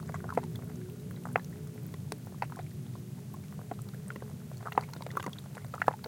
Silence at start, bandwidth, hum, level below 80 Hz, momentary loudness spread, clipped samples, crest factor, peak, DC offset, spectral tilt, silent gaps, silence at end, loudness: 0 s; 17 kHz; none; -64 dBFS; 8 LU; under 0.1%; 32 dB; -6 dBFS; under 0.1%; -6 dB/octave; none; 0 s; -39 LUFS